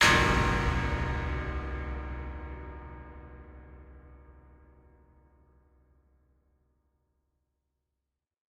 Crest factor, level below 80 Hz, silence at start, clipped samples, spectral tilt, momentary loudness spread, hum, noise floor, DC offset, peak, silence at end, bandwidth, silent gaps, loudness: 24 dB; -40 dBFS; 0 s; under 0.1%; -4 dB/octave; 26 LU; none; -87 dBFS; under 0.1%; -10 dBFS; 4.2 s; 15.5 kHz; none; -30 LUFS